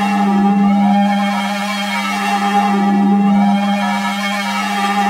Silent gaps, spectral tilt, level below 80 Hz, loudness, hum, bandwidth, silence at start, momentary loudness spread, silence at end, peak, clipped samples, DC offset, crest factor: none; -5.5 dB/octave; -58 dBFS; -15 LUFS; none; 15 kHz; 0 s; 5 LU; 0 s; -2 dBFS; under 0.1%; under 0.1%; 12 dB